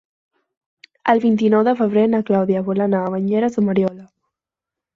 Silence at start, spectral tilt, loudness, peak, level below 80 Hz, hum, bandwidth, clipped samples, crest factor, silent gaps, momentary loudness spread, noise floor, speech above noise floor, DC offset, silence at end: 1.05 s; -8.5 dB/octave; -18 LUFS; -2 dBFS; -62 dBFS; none; 7.2 kHz; under 0.1%; 16 dB; none; 5 LU; -86 dBFS; 70 dB; under 0.1%; 0.9 s